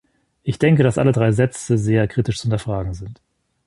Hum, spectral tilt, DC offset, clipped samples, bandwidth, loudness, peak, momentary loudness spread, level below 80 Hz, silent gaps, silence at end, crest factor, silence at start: none; -7 dB/octave; under 0.1%; under 0.1%; 11.5 kHz; -19 LUFS; -2 dBFS; 14 LU; -42 dBFS; none; 0.55 s; 16 dB; 0.45 s